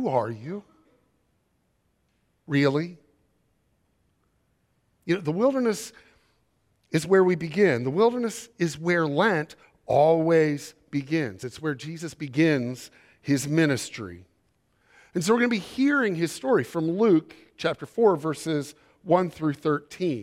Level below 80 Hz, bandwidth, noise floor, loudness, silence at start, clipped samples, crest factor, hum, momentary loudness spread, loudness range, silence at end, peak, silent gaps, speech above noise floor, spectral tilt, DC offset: -68 dBFS; 15.5 kHz; -71 dBFS; -25 LUFS; 0 s; under 0.1%; 20 dB; none; 14 LU; 8 LU; 0 s; -6 dBFS; none; 47 dB; -6 dB/octave; under 0.1%